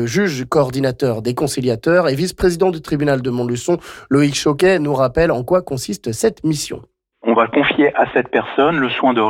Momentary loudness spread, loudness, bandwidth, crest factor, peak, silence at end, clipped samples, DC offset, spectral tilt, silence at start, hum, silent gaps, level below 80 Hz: 6 LU; -17 LUFS; 16.5 kHz; 12 dB; -4 dBFS; 0 s; under 0.1%; under 0.1%; -5.5 dB/octave; 0 s; none; none; -42 dBFS